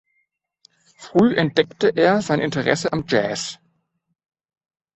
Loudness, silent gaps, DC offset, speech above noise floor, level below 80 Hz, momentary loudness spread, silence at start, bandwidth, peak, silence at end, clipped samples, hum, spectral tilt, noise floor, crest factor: -19 LUFS; none; under 0.1%; 54 dB; -58 dBFS; 7 LU; 1 s; 8.4 kHz; -2 dBFS; 1.4 s; under 0.1%; none; -5 dB/octave; -73 dBFS; 20 dB